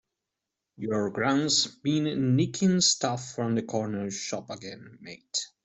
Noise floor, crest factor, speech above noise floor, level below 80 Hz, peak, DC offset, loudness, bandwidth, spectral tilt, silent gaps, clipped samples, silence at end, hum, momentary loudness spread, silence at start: -86 dBFS; 18 dB; 58 dB; -66 dBFS; -10 dBFS; under 0.1%; -27 LUFS; 8.4 kHz; -4 dB/octave; none; under 0.1%; 0.2 s; none; 17 LU; 0.8 s